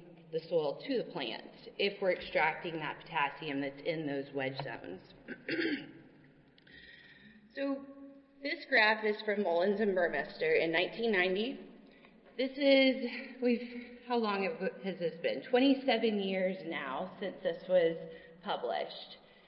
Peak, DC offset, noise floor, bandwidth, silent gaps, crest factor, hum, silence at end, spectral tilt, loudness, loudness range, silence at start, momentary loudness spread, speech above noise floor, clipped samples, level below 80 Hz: -14 dBFS; under 0.1%; -62 dBFS; 5.8 kHz; none; 22 dB; none; 0.3 s; -8.5 dB/octave; -33 LUFS; 9 LU; 0 s; 17 LU; 28 dB; under 0.1%; -72 dBFS